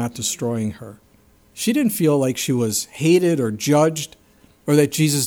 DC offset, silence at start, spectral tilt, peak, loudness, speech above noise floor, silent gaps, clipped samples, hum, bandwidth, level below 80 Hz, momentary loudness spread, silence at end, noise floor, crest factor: under 0.1%; 0 s; -5 dB/octave; -4 dBFS; -19 LUFS; 35 dB; none; under 0.1%; none; 20 kHz; -60 dBFS; 11 LU; 0 s; -54 dBFS; 16 dB